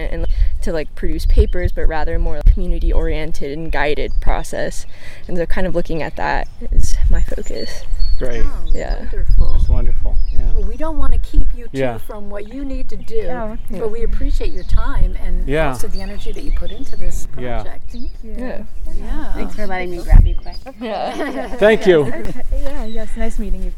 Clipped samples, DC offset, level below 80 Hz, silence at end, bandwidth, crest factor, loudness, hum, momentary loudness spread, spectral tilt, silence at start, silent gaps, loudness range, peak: 1%; under 0.1%; -16 dBFS; 0 s; 7.6 kHz; 12 dB; -22 LUFS; none; 12 LU; -6.5 dB/octave; 0 s; none; 8 LU; 0 dBFS